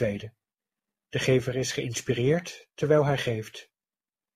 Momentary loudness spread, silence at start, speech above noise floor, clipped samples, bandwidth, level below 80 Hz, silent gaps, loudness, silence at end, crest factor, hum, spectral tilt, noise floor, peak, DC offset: 18 LU; 0 s; over 63 dB; under 0.1%; 15.5 kHz; -58 dBFS; none; -27 LUFS; 0.75 s; 18 dB; none; -5.5 dB/octave; under -90 dBFS; -10 dBFS; under 0.1%